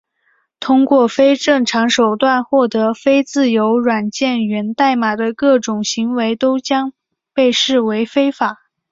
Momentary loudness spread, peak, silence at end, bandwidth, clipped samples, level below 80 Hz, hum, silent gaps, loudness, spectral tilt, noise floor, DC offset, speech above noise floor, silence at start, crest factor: 6 LU; 0 dBFS; 0.4 s; 7.8 kHz; under 0.1%; -60 dBFS; none; none; -15 LUFS; -4 dB/octave; -62 dBFS; under 0.1%; 48 dB; 0.6 s; 14 dB